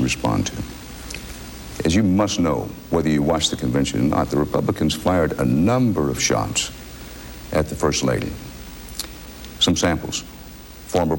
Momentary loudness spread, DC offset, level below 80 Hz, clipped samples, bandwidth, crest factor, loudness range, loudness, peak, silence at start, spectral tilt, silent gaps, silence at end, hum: 18 LU; under 0.1%; -40 dBFS; under 0.1%; 16.5 kHz; 16 dB; 4 LU; -21 LUFS; -6 dBFS; 0 s; -4.5 dB/octave; none; 0 s; none